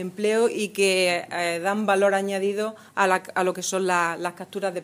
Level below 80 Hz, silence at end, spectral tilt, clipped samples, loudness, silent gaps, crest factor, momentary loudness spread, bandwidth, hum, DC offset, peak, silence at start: -80 dBFS; 0 s; -3.5 dB/octave; under 0.1%; -23 LUFS; none; 18 dB; 9 LU; 16 kHz; none; under 0.1%; -6 dBFS; 0 s